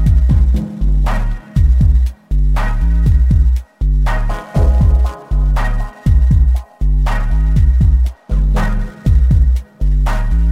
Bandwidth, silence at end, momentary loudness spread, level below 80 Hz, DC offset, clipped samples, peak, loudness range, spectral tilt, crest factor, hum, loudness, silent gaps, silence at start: 6.2 kHz; 0 s; 7 LU; -12 dBFS; under 0.1%; under 0.1%; -2 dBFS; 0 LU; -8 dB/octave; 8 dB; none; -15 LUFS; none; 0 s